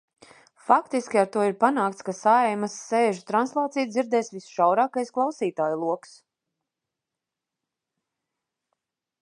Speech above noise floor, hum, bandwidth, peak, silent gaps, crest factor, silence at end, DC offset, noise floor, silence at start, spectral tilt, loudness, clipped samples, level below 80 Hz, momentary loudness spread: 63 dB; none; 11.5 kHz; -4 dBFS; none; 22 dB; 3.25 s; under 0.1%; -87 dBFS; 0.7 s; -5 dB/octave; -24 LUFS; under 0.1%; -80 dBFS; 7 LU